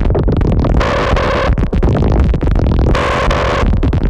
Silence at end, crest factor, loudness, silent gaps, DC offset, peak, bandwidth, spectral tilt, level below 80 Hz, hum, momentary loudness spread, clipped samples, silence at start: 0 s; 10 dB; -14 LUFS; none; under 0.1%; -2 dBFS; 9 kHz; -7 dB/octave; -14 dBFS; none; 1 LU; under 0.1%; 0 s